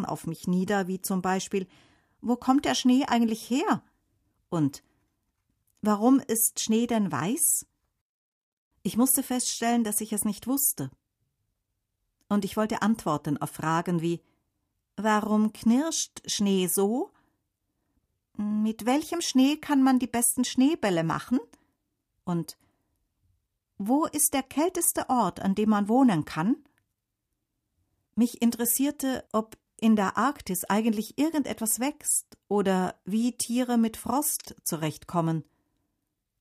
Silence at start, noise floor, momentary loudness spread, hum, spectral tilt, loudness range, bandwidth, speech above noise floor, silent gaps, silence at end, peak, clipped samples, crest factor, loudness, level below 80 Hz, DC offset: 0 s; -82 dBFS; 9 LU; none; -4 dB/octave; 4 LU; 15.5 kHz; 56 dB; 8.01-8.71 s; 1 s; -8 dBFS; under 0.1%; 20 dB; -26 LUFS; -64 dBFS; under 0.1%